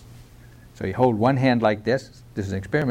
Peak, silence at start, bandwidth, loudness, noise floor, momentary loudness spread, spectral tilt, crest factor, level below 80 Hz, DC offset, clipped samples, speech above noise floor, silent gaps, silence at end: -6 dBFS; 0.1 s; 14.5 kHz; -22 LUFS; -47 dBFS; 13 LU; -7.5 dB/octave; 16 dB; -50 dBFS; under 0.1%; under 0.1%; 25 dB; none; 0 s